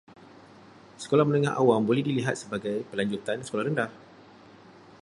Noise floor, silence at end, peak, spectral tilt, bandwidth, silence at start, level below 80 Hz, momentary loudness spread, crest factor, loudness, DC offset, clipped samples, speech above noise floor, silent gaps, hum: -52 dBFS; 1.05 s; -8 dBFS; -6.5 dB/octave; 11.5 kHz; 1 s; -68 dBFS; 9 LU; 20 dB; -27 LUFS; under 0.1%; under 0.1%; 26 dB; none; none